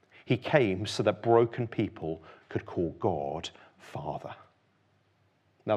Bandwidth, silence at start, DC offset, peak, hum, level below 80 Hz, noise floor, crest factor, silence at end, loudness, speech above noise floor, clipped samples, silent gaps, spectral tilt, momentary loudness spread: 11.5 kHz; 0.25 s; under 0.1%; -6 dBFS; none; -62 dBFS; -69 dBFS; 24 dB; 0 s; -30 LUFS; 40 dB; under 0.1%; none; -6.5 dB/octave; 17 LU